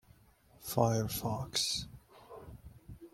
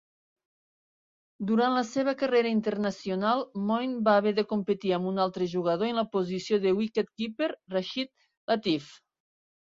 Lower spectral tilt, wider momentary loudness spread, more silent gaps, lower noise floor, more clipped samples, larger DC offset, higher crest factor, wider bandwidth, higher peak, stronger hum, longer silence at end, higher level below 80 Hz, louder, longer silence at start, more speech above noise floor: second, -4 dB/octave vs -6 dB/octave; first, 23 LU vs 8 LU; second, none vs 8.37-8.48 s; second, -64 dBFS vs under -90 dBFS; neither; neither; about the same, 24 dB vs 20 dB; first, 16.5 kHz vs 7.6 kHz; about the same, -12 dBFS vs -10 dBFS; neither; second, 0.05 s vs 0.8 s; first, -58 dBFS vs -72 dBFS; second, -34 LUFS vs -28 LUFS; second, 0.6 s vs 1.4 s; second, 31 dB vs over 62 dB